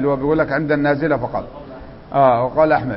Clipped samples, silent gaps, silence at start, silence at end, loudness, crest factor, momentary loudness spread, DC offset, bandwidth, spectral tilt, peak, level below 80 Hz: under 0.1%; none; 0 s; 0 s; -17 LUFS; 16 dB; 20 LU; under 0.1%; 5.8 kHz; -12 dB/octave; -2 dBFS; -42 dBFS